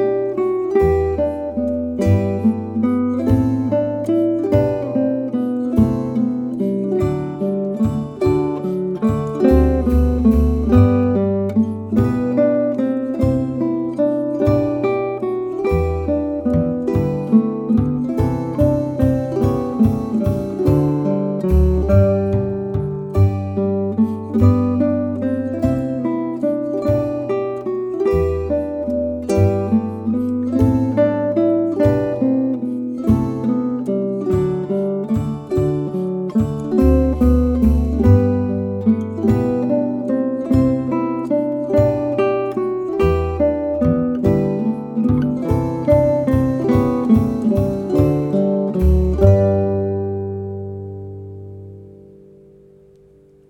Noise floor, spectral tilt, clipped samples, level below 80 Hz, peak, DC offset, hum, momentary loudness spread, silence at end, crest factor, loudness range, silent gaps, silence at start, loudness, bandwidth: -49 dBFS; -10 dB/octave; under 0.1%; -30 dBFS; 0 dBFS; under 0.1%; none; 7 LU; 1.55 s; 16 dB; 4 LU; none; 0 s; -18 LUFS; 13.5 kHz